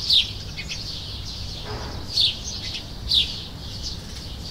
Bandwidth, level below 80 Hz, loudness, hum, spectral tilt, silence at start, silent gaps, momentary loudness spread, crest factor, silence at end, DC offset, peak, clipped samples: 16 kHz; -38 dBFS; -25 LUFS; none; -2.5 dB/octave; 0 s; none; 13 LU; 20 dB; 0 s; under 0.1%; -6 dBFS; under 0.1%